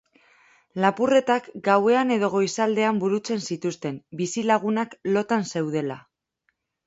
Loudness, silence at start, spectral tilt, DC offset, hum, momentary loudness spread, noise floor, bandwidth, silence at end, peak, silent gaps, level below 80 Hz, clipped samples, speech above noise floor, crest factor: -23 LUFS; 0.75 s; -5 dB/octave; under 0.1%; none; 10 LU; -74 dBFS; 8 kHz; 0.85 s; -4 dBFS; none; -70 dBFS; under 0.1%; 51 dB; 20 dB